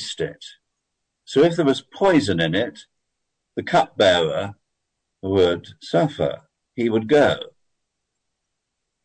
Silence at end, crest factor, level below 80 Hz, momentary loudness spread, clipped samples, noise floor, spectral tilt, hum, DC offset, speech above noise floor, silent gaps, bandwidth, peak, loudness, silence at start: 1.6 s; 16 dB; -56 dBFS; 16 LU; under 0.1%; -78 dBFS; -5.5 dB/octave; none; under 0.1%; 59 dB; none; 9.4 kHz; -6 dBFS; -20 LUFS; 0 s